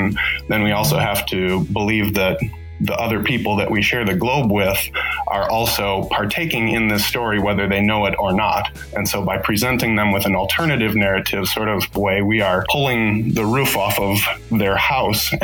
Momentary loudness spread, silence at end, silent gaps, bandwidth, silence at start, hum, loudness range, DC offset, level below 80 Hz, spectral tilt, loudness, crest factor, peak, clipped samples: 3 LU; 0 s; none; 19 kHz; 0 s; none; 1 LU; under 0.1%; -38 dBFS; -4.5 dB/octave; -18 LUFS; 14 dB; -4 dBFS; under 0.1%